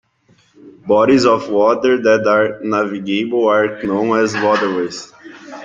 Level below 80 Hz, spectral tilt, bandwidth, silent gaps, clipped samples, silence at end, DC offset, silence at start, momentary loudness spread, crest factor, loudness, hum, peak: -58 dBFS; -5 dB/octave; 7.8 kHz; none; under 0.1%; 0 s; under 0.1%; 0.65 s; 11 LU; 14 dB; -15 LUFS; none; -2 dBFS